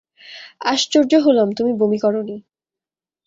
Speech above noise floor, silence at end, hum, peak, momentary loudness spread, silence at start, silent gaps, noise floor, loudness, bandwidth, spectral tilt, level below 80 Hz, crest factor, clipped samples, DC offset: 73 dB; 0.85 s; none; -2 dBFS; 21 LU; 0.25 s; none; -90 dBFS; -17 LUFS; 7.8 kHz; -4.5 dB/octave; -66 dBFS; 16 dB; under 0.1%; under 0.1%